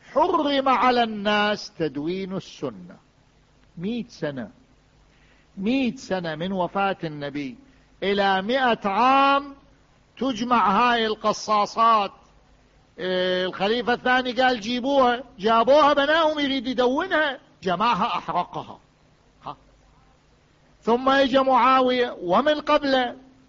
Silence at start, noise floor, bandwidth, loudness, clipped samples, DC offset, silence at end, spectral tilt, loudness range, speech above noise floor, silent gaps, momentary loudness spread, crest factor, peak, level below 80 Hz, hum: 0.1 s; -58 dBFS; 7.6 kHz; -22 LUFS; under 0.1%; under 0.1%; 0.3 s; -5 dB/octave; 10 LU; 36 dB; none; 14 LU; 14 dB; -8 dBFS; -56 dBFS; none